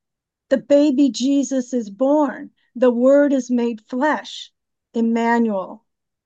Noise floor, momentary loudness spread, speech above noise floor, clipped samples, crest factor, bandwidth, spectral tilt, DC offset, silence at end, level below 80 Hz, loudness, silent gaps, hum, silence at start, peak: -80 dBFS; 14 LU; 63 dB; under 0.1%; 14 dB; 8.2 kHz; -5 dB/octave; under 0.1%; 0.5 s; -76 dBFS; -19 LUFS; none; none; 0.5 s; -4 dBFS